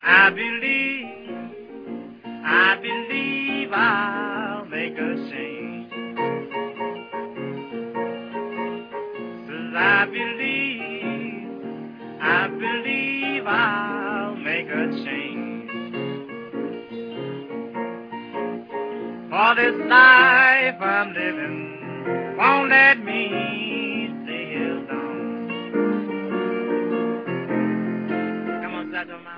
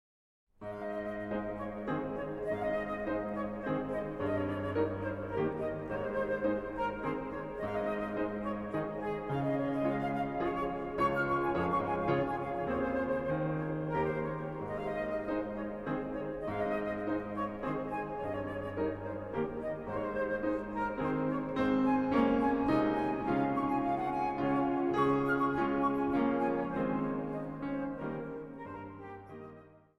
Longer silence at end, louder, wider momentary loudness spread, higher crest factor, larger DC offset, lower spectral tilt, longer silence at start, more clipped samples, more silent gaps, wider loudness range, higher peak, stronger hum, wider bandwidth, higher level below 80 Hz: second, 0 s vs 0.2 s; first, -21 LUFS vs -34 LUFS; first, 18 LU vs 9 LU; first, 22 dB vs 16 dB; neither; second, -7 dB/octave vs -8.5 dB/octave; second, 0 s vs 0.6 s; neither; neither; first, 14 LU vs 6 LU; first, 0 dBFS vs -16 dBFS; neither; second, 5.2 kHz vs 11.5 kHz; second, -70 dBFS vs -56 dBFS